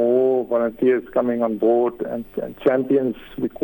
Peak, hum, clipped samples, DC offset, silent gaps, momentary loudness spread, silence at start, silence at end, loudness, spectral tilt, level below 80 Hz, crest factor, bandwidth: -6 dBFS; none; under 0.1%; under 0.1%; none; 10 LU; 0 s; 0 s; -21 LUFS; -9 dB/octave; -54 dBFS; 14 dB; 18 kHz